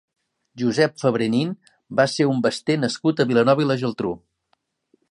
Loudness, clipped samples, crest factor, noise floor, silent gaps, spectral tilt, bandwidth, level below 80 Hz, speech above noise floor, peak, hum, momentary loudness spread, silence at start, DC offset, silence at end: -21 LUFS; under 0.1%; 18 dB; -70 dBFS; none; -6 dB/octave; 11.5 kHz; -62 dBFS; 49 dB; -4 dBFS; none; 10 LU; 0.55 s; under 0.1%; 0.95 s